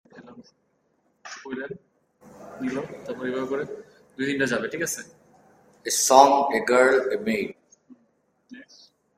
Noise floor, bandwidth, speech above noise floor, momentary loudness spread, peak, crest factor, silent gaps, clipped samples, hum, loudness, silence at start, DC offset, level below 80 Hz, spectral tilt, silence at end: -69 dBFS; 16 kHz; 47 dB; 21 LU; 0 dBFS; 24 dB; none; under 0.1%; none; -23 LUFS; 0.15 s; under 0.1%; -68 dBFS; -2.5 dB/octave; 0.55 s